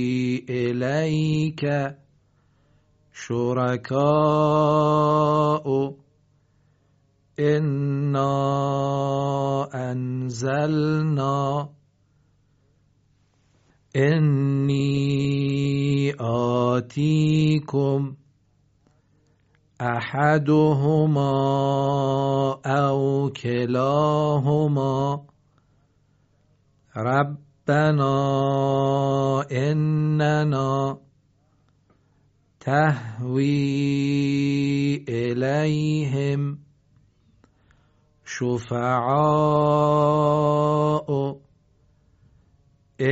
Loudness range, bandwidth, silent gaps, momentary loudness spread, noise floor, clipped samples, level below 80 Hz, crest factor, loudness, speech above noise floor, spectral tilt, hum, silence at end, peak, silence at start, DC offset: 5 LU; 8 kHz; none; 8 LU; -63 dBFS; under 0.1%; -58 dBFS; 18 dB; -22 LUFS; 42 dB; -7 dB/octave; none; 0 s; -6 dBFS; 0 s; under 0.1%